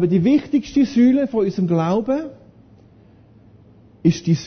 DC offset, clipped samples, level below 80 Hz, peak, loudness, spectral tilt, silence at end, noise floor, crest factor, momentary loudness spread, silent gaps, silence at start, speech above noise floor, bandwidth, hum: under 0.1%; under 0.1%; -52 dBFS; -4 dBFS; -18 LUFS; -8 dB/octave; 0 s; -49 dBFS; 16 dB; 7 LU; none; 0 s; 32 dB; 6.6 kHz; none